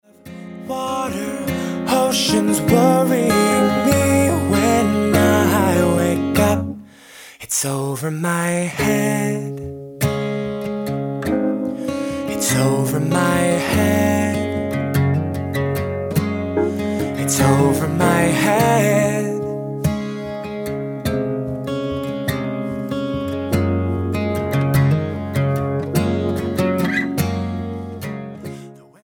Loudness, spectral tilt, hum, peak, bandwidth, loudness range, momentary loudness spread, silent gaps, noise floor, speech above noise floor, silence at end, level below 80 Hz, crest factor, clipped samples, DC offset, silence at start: -19 LUFS; -5.5 dB/octave; none; 0 dBFS; 17.5 kHz; 7 LU; 11 LU; none; -42 dBFS; 25 dB; 0.25 s; -44 dBFS; 18 dB; under 0.1%; under 0.1%; 0.25 s